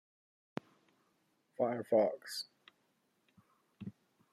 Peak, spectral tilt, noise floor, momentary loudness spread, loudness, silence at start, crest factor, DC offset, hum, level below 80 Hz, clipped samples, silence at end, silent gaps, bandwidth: -18 dBFS; -5 dB/octave; -78 dBFS; 20 LU; -35 LUFS; 1.6 s; 22 dB; under 0.1%; none; -88 dBFS; under 0.1%; 0.45 s; none; 13.5 kHz